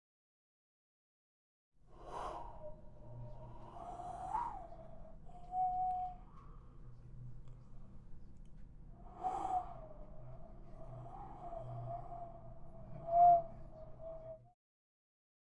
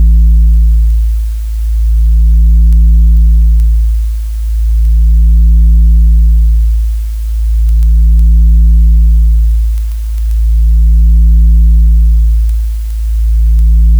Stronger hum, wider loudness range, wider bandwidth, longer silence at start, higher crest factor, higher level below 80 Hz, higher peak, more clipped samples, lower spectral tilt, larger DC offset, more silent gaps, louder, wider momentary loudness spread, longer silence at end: neither; first, 16 LU vs 0 LU; first, 9.2 kHz vs 0.4 kHz; first, 1.8 s vs 0 s; first, 22 dB vs 4 dB; second, -56 dBFS vs -6 dBFS; second, -20 dBFS vs -2 dBFS; neither; about the same, -8 dB/octave vs -8 dB/octave; neither; neither; second, -38 LUFS vs -10 LUFS; first, 22 LU vs 8 LU; first, 0.95 s vs 0 s